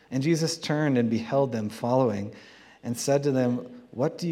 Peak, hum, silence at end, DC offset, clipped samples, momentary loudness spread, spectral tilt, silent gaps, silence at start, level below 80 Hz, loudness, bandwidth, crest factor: -10 dBFS; none; 0 s; under 0.1%; under 0.1%; 10 LU; -6 dB/octave; none; 0.1 s; -72 dBFS; -26 LUFS; 15.5 kHz; 16 dB